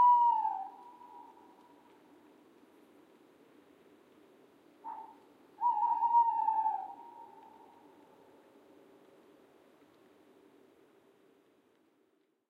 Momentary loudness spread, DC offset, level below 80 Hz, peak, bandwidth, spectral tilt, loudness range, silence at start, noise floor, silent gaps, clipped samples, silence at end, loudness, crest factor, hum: 27 LU; under 0.1%; under -90 dBFS; -18 dBFS; 4.2 kHz; -4.5 dB/octave; 21 LU; 0 s; -74 dBFS; none; under 0.1%; 5.25 s; -31 LUFS; 18 dB; none